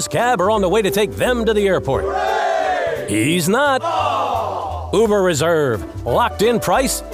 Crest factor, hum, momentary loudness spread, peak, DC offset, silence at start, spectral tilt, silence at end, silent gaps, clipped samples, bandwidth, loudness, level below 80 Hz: 14 dB; none; 5 LU; -4 dBFS; under 0.1%; 0 s; -4.5 dB/octave; 0 s; none; under 0.1%; 16 kHz; -17 LUFS; -38 dBFS